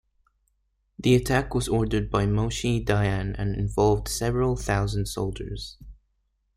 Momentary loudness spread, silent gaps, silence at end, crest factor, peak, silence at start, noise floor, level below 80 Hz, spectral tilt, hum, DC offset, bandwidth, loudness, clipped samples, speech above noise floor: 8 LU; none; 0.65 s; 20 dB; -6 dBFS; 1 s; -72 dBFS; -38 dBFS; -6 dB/octave; none; under 0.1%; 15 kHz; -25 LUFS; under 0.1%; 48 dB